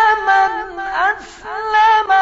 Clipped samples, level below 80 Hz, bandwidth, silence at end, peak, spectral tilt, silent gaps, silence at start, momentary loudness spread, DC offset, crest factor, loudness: under 0.1%; -46 dBFS; 7.8 kHz; 0 s; -2 dBFS; 2 dB/octave; none; 0 s; 13 LU; under 0.1%; 14 dB; -15 LUFS